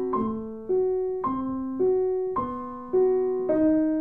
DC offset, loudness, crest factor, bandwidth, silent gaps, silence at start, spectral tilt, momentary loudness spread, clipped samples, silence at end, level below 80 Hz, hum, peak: 0.3%; -26 LUFS; 12 dB; 3.4 kHz; none; 0 s; -11 dB/octave; 8 LU; under 0.1%; 0 s; -54 dBFS; none; -12 dBFS